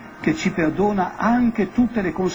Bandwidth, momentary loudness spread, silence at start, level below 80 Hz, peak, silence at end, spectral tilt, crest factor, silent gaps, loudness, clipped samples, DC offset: 7.6 kHz; 3 LU; 0 s; -44 dBFS; -4 dBFS; 0 s; -6.5 dB/octave; 16 dB; none; -21 LUFS; under 0.1%; under 0.1%